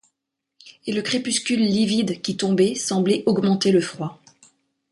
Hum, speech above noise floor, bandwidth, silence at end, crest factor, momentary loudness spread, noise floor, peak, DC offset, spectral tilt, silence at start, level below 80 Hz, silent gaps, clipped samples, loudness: none; 60 dB; 11.5 kHz; 0.75 s; 16 dB; 9 LU; -80 dBFS; -6 dBFS; under 0.1%; -4.5 dB/octave; 0.65 s; -62 dBFS; none; under 0.1%; -21 LUFS